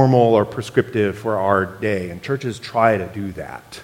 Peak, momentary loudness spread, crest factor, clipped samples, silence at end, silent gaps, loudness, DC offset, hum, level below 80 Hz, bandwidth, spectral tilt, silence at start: 0 dBFS; 13 LU; 18 dB; under 0.1%; 0 s; none; -20 LUFS; under 0.1%; none; -52 dBFS; 16.5 kHz; -7 dB/octave; 0 s